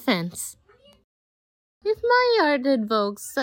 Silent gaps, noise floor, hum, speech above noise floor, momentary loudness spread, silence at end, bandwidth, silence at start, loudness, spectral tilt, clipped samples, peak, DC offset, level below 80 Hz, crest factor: 1.04-1.81 s; under -90 dBFS; none; over 68 dB; 13 LU; 0 s; 17 kHz; 0 s; -22 LUFS; -4 dB/octave; under 0.1%; -8 dBFS; under 0.1%; -64 dBFS; 16 dB